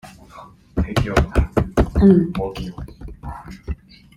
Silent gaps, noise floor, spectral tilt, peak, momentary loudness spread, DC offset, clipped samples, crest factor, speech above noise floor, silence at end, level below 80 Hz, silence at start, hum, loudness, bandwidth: none; -43 dBFS; -7.5 dB/octave; 0 dBFS; 21 LU; under 0.1%; under 0.1%; 20 dB; 26 dB; 0.45 s; -28 dBFS; 0.05 s; none; -18 LUFS; 13 kHz